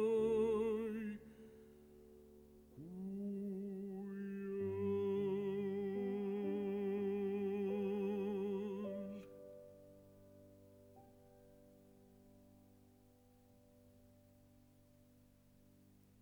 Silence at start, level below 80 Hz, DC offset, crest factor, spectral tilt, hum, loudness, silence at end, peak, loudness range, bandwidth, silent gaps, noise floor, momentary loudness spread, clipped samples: 0 s; -74 dBFS; under 0.1%; 16 dB; -8.5 dB/octave; none; -41 LUFS; 3.7 s; -28 dBFS; 14 LU; 19 kHz; none; -68 dBFS; 25 LU; under 0.1%